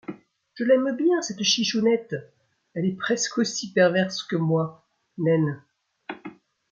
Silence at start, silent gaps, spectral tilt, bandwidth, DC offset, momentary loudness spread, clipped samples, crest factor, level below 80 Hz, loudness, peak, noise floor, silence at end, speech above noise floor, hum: 0.1 s; none; -4.5 dB/octave; 7.8 kHz; under 0.1%; 19 LU; under 0.1%; 18 dB; -72 dBFS; -23 LUFS; -6 dBFS; -44 dBFS; 0.4 s; 21 dB; none